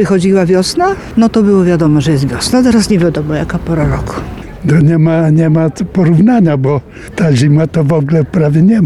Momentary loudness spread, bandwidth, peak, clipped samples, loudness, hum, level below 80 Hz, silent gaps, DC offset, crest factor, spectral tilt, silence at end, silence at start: 7 LU; 12.5 kHz; -2 dBFS; under 0.1%; -10 LUFS; none; -32 dBFS; none; 0.3%; 8 dB; -7 dB/octave; 0 s; 0 s